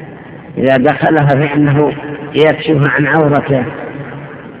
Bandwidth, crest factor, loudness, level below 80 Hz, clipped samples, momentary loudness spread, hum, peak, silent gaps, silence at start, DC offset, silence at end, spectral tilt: 4 kHz; 12 dB; -11 LUFS; -44 dBFS; 0.3%; 16 LU; none; 0 dBFS; none; 0 s; under 0.1%; 0 s; -11 dB/octave